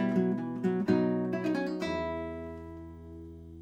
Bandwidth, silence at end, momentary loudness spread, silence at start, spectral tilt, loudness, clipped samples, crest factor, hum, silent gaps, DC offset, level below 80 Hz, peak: 8.8 kHz; 0 s; 19 LU; 0 s; -8 dB/octave; -31 LUFS; under 0.1%; 18 dB; none; none; under 0.1%; -56 dBFS; -14 dBFS